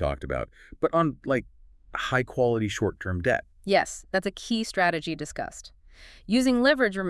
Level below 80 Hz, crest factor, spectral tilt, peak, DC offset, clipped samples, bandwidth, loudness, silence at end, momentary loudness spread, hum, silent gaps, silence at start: -48 dBFS; 20 dB; -5 dB/octave; -6 dBFS; under 0.1%; under 0.1%; 12 kHz; -26 LUFS; 0 s; 12 LU; none; none; 0 s